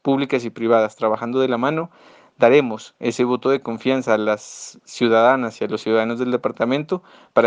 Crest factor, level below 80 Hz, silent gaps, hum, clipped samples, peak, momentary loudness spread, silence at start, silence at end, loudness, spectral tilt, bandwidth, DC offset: 18 dB; -70 dBFS; none; none; under 0.1%; -2 dBFS; 12 LU; 0.05 s; 0 s; -20 LUFS; -5.5 dB/octave; 9.6 kHz; under 0.1%